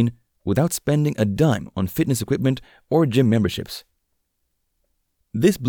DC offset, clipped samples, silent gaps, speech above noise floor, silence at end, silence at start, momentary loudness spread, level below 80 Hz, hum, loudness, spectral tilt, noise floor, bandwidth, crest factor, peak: under 0.1%; under 0.1%; none; 53 dB; 0 s; 0 s; 12 LU; -52 dBFS; none; -21 LUFS; -6.5 dB/octave; -73 dBFS; 19.5 kHz; 18 dB; -4 dBFS